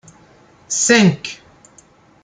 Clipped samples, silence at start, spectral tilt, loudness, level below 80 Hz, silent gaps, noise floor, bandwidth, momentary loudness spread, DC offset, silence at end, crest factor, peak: under 0.1%; 0.7 s; -3.5 dB/octave; -14 LUFS; -60 dBFS; none; -50 dBFS; 9.6 kHz; 20 LU; under 0.1%; 0.9 s; 18 dB; -2 dBFS